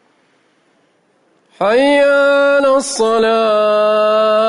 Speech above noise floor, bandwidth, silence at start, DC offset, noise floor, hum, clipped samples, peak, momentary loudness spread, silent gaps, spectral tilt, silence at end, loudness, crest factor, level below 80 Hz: 45 dB; 11 kHz; 1.6 s; under 0.1%; -57 dBFS; none; under 0.1%; -4 dBFS; 4 LU; none; -3 dB/octave; 0 s; -12 LUFS; 10 dB; -58 dBFS